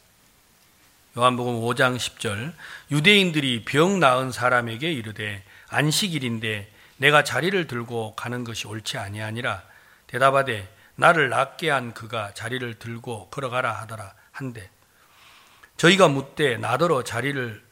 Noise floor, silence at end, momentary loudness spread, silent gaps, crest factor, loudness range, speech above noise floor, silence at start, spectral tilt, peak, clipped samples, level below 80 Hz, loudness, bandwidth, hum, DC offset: -58 dBFS; 0.15 s; 17 LU; none; 22 dB; 7 LU; 35 dB; 1.15 s; -4.5 dB/octave; -2 dBFS; under 0.1%; -62 dBFS; -22 LUFS; 16.5 kHz; none; under 0.1%